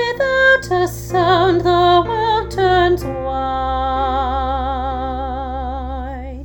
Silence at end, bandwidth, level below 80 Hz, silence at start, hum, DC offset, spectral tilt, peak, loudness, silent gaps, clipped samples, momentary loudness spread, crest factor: 0 s; 19.5 kHz; -30 dBFS; 0 s; none; under 0.1%; -5.5 dB/octave; 0 dBFS; -17 LUFS; none; under 0.1%; 12 LU; 16 dB